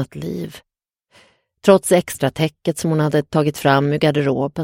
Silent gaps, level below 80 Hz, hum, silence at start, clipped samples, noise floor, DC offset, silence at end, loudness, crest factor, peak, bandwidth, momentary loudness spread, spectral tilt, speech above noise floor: none; -54 dBFS; none; 0 s; under 0.1%; -58 dBFS; under 0.1%; 0 s; -18 LUFS; 18 dB; 0 dBFS; 16.5 kHz; 12 LU; -6 dB/octave; 40 dB